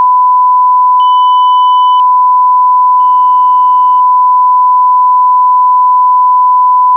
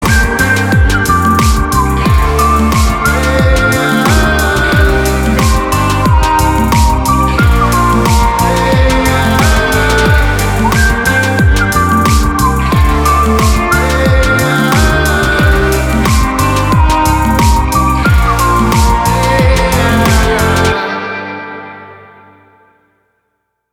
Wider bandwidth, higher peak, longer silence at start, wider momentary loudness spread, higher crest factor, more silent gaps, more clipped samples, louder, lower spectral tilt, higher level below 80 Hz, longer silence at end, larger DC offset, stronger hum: second, 3.2 kHz vs 19 kHz; about the same, -2 dBFS vs 0 dBFS; about the same, 0 s vs 0 s; about the same, 0 LU vs 2 LU; second, 4 dB vs 10 dB; neither; neither; first, -6 LUFS vs -10 LUFS; second, 8.5 dB/octave vs -5 dB/octave; second, under -90 dBFS vs -14 dBFS; second, 0 s vs 1.8 s; neither; neither